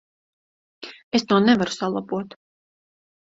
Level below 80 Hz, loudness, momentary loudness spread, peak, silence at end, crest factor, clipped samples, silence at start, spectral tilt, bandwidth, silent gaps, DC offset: -64 dBFS; -21 LUFS; 22 LU; -4 dBFS; 1.05 s; 22 dB; under 0.1%; 0.8 s; -5 dB/octave; 7.8 kHz; 1.04-1.11 s; under 0.1%